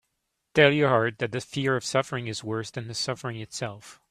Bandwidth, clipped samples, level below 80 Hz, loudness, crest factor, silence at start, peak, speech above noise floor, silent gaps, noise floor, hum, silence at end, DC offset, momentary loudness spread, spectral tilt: 14 kHz; under 0.1%; -62 dBFS; -26 LUFS; 24 dB; 0.55 s; -4 dBFS; 53 dB; none; -79 dBFS; none; 0.2 s; under 0.1%; 14 LU; -4.5 dB/octave